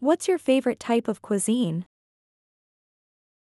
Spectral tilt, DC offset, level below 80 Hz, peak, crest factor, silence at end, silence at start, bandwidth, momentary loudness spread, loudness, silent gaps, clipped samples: -5 dB/octave; under 0.1%; -70 dBFS; -10 dBFS; 16 dB; 1.7 s; 0 s; 13.5 kHz; 6 LU; -25 LUFS; none; under 0.1%